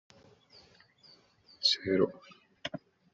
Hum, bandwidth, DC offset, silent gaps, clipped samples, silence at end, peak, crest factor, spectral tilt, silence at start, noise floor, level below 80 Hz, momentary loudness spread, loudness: none; 7.6 kHz; under 0.1%; none; under 0.1%; 0.35 s; -14 dBFS; 24 dB; -2.5 dB/octave; 1.6 s; -62 dBFS; -74 dBFS; 19 LU; -31 LUFS